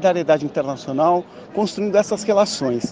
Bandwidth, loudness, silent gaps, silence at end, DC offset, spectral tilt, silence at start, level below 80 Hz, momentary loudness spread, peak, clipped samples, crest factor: 9.6 kHz; -20 LUFS; none; 0 s; under 0.1%; -5 dB/octave; 0 s; -60 dBFS; 6 LU; -2 dBFS; under 0.1%; 16 dB